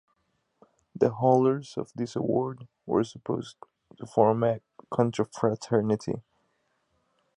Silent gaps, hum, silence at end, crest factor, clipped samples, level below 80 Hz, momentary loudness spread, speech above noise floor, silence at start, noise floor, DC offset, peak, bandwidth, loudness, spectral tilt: none; none; 1.2 s; 22 dB; under 0.1%; -66 dBFS; 13 LU; 48 dB; 0.95 s; -74 dBFS; under 0.1%; -8 dBFS; 11 kHz; -27 LUFS; -7.5 dB/octave